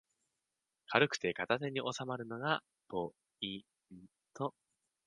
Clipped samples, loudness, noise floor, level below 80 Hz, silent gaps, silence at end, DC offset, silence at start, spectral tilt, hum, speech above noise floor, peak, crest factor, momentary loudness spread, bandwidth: under 0.1%; -37 LUFS; -89 dBFS; -78 dBFS; none; 0.55 s; under 0.1%; 0.9 s; -4.5 dB/octave; none; 51 dB; -10 dBFS; 30 dB; 12 LU; 10.5 kHz